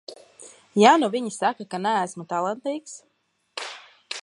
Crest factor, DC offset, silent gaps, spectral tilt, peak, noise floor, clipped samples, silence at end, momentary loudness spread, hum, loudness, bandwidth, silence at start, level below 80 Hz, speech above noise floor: 22 dB; under 0.1%; none; -4 dB/octave; -2 dBFS; -49 dBFS; under 0.1%; 0.05 s; 26 LU; none; -23 LUFS; 11.5 kHz; 0.1 s; -78 dBFS; 27 dB